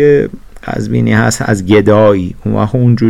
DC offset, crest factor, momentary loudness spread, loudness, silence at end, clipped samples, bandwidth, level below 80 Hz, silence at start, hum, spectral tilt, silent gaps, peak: under 0.1%; 10 dB; 12 LU; -11 LUFS; 0 s; under 0.1%; 13 kHz; -34 dBFS; 0 s; none; -6.5 dB/octave; none; 0 dBFS